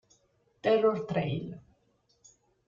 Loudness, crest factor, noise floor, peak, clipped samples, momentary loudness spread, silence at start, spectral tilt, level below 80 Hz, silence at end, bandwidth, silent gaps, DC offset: -29 LUFS; 18 dB; -71 dBFS; -14 dBFS; under 0.1%; 17 LU; 0.65 s; -7 dB/octave; -66 dBFS; 1.1 s; 7.4 kHz; none; under 0.1%